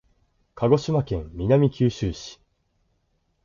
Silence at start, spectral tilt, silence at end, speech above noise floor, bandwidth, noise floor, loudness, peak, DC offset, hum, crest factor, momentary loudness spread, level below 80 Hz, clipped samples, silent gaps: 0.55 s; -7.5 dB/octave; 1.1 s; 48 dB; 7.4 kHz; -70 dBFS; -23 LUFS; -6 dBFS; under 0.1%; none; 18 dB; 11 LU; -44 dBFS; under 0.1%; none